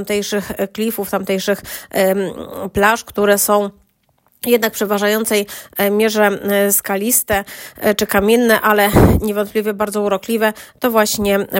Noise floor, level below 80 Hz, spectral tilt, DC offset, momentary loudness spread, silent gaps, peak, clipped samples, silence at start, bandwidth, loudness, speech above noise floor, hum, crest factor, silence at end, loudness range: -60 dBFS; -36 dBFS; -4 dB/octave; under 0.1%; 9 LU; none; 0 dBFS; under 0.1%; 0 s; 16.5 kHz; -16 LUFS; 44 dB; none; 16 dB; 0 s; 3 LU